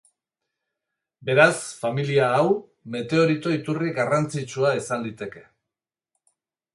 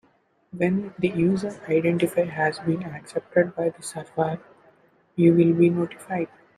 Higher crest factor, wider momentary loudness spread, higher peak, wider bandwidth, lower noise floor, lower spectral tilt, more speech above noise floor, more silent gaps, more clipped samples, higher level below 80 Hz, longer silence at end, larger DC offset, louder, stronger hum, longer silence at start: first, 24 dB vs 18 dB; about the same, 15 LU vs 13 LU; first, -2 dBFS vs -6 dBFS; second, 11.5 kHz vs 13.5 kHz; first, -88 dBFS vs -64 dBFS; second, -5.5 dB/octave vs -7.5 dB/octave; first, 66 dB vs 41 dB; neither; neither; second, -68 dBFS vs -62 dBFS; first, 1.35 s vs 0.3 s; neither; about the same, -23 LUFS vs -24 LUFS; neither; first, 1.2 s vs 0.55 s